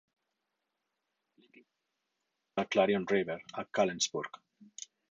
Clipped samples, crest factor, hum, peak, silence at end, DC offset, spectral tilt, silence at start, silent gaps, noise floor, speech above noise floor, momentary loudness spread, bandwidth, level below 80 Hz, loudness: under 0.1%; 22 dB; none; -14 dBFS; 0.45 s; under 0.1%; -3.5 dB/octave; 2.55 s; none; -85 dBFS; 53 dB; 19 LU; 8.8 kHz; -76 dBFS; -32 LUFS